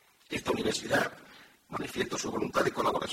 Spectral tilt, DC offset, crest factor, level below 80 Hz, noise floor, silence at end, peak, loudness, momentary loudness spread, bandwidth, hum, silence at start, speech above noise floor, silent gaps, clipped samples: -3.5 dB/octave; under 0.1%; 20 dB; -60 dBFS; -55 dBFS; 0 s; -14 dBFS; -32 LUFS; 10 LU; 16.5 kHz; none; 0.3 s; 24 dB; none; under 0.1%